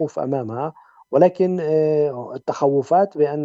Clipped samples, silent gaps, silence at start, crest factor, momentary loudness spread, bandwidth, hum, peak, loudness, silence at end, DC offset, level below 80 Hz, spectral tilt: under 0.1%; none; 0 s; 18 dB; 11 LU; 7.8 kHz; none; -2 dBFS; -20 LUFS; 0 s; under 0.1%; -70 dBFS; -8.5 dB/octave